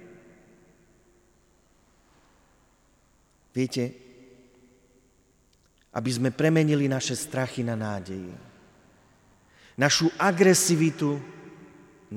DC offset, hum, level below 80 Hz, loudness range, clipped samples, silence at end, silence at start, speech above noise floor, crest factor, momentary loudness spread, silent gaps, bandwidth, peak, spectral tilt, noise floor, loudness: under 0.1%; none; -66 dBFS; 12 LU; under 0.1%; 0 s; 0 s; 39 dB; 22 dB; 21 LU; none; 17 kHz; -6 dBFS; -4.5 dB/octave; -63 dBFS; -25 LUFS